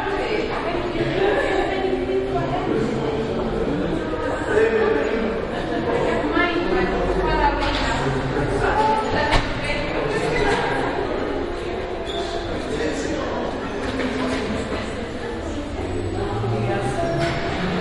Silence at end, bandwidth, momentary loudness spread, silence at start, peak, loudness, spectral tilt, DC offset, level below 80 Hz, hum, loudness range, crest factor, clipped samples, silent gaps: 0 s; 11.5 kHz; 7 LU; 0 s; -2 dBFS; -22 LUFS; -6 dB/octave; under 0.1%; -34 dBFS; none; 5 LU; 18 dB; under 0.1%; none